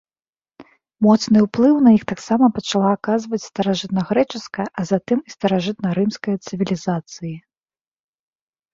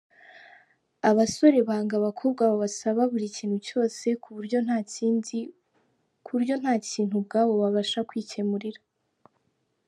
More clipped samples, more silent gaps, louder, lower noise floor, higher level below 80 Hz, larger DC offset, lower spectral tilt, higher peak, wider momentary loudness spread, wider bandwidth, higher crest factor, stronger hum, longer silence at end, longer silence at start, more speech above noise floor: neither; neither; first, -19 LUFS vs -26 LUFS; first, under -90 dBFS vs -74 dBFS; first, -58 dBFS vs -74 dBFS; neither; first, -6.5 dB/octave vs -5 dB/octave; first, -2 dBFS vs -6 dBFS; about the same, 12 LU vs 10 LU; second, 7.6 kHz vs 11.5 kHz; about the same, 18 dB vs 20 dB; neither; first, 1.35 s vs 1.1 s; first, 0.6 s vs 0.35 s; first, over 72 dB vs 49 dB